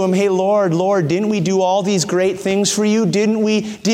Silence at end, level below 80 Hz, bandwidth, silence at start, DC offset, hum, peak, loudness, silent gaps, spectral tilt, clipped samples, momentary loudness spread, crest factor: 0 s; -58 dBFS; 15.5 kHz; 0 s; under 0.1%; none; -4 dBFS; -16 LUFS; none; -5 dB/octave; under 0.1%; 2 LU; 12 dB